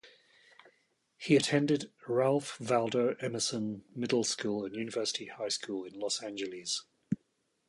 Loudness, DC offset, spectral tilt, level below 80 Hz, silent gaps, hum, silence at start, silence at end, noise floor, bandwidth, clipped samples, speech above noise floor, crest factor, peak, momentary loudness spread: -33 LUFS; under 0.1%; -4 dB/octave; -74 dBFS; none; none; 0.05 s; 0.55 s; -77 dBFS; 11.5 kHz; under 0.1%; 45 dB; 20 dB; -12 dBFS; 11 LU